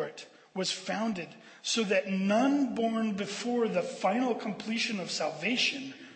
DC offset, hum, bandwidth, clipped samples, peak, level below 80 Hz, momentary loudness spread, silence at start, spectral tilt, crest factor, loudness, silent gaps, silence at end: under 0.1%; none; 8.8 kHz; under 0.1%; -16 dBFS; -78 dBFS; 11 LU; 0 s; -4 dB/octave; 16 dB; -30 LUFS; none; 0 s